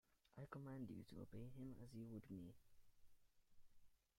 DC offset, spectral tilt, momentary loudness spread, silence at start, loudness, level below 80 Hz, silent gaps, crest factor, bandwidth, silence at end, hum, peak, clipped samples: under 0.1%; -8 dB/octave; 6 LU; 0.1 s; -58 LUFS; -76 dBFS; none; 18 dB; 16 kHz; 0.25 s; none; -40 dBFS; under 0.1%